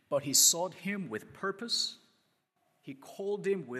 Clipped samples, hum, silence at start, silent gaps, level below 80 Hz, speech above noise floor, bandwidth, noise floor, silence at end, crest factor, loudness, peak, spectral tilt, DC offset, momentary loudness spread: under 0.1%; none; 0.1 s; none; -84 dBFS; 43 dB; 14.5 kHz; -76 dBFS; 0 s; 22 dB; -29 LUFS; -10 dBFS; -1.5 dB/octave; under 0.1%; 21 LU